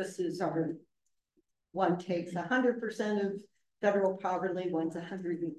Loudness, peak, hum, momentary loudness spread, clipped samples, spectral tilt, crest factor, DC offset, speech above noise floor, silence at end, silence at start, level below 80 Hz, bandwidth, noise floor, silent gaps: -33 LUFS; -16 dBFS; none; 8 LU; under 0.1%; -6.5 dB/octave; 18 dB; under 0.1%; 45 dB; 0 s; 0 s; -82 dBFS; 12.5 kHz; -77 dBFS; none